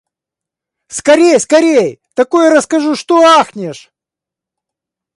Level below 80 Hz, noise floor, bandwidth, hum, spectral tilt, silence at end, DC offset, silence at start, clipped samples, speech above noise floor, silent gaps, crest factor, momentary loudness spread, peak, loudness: -60 dBFS; -85 dBFS; 11.5 kHz; none; -3.5 dB/octave; 1.4 s; under 0.1%; 0.9 s; under 0.1%; 75 dB; none; 12 dB; 12 LU; 0 dBFS; -10 LUFS